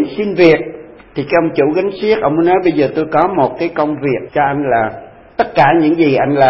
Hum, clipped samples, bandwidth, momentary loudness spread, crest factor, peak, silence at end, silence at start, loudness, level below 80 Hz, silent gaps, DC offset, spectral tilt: none; under 0.1%; 5.8 kHz; 11 LU; 14 dB; 0 dBFS; 0 s; 0 s; -13 LUFS; -46 dBFS; none; under 0.1%; -9 dB/octave